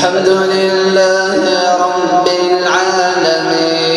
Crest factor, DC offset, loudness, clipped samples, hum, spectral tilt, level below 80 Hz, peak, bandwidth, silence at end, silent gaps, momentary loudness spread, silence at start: 12 dB; under 0.1%; -11 LUFS; under 0.1%; none; -3.5 dB/octave; -56 dBFS; 0 dBFS; 11.5 kHz; 0 s; none; 2 LU; 0 s